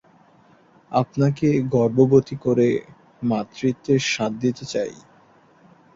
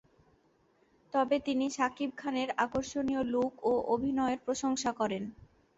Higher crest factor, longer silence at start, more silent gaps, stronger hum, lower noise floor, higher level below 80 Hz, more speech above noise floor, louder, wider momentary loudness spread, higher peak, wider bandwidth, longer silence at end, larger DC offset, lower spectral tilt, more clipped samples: about the same, 20 dB vs 18 dB; second, 0.9 s vs 1.15 s; neither; neither; second, -54 dBFS vs -69 dBFS; about the same, -58 dBFS vs -62 dBFS; about the same, 34 dB vs 37 dB; first, -21 LUFS vs -32 LUFS; first, 10 LU vs 4 LU; first, -2 dBFS vs -14 dBFS; about the same, 7.8 kHz vs 8 kHz; first, 1 s vs 0.35 s; neither; first, -6.5 dB/octave vs -4 dB/octave; neither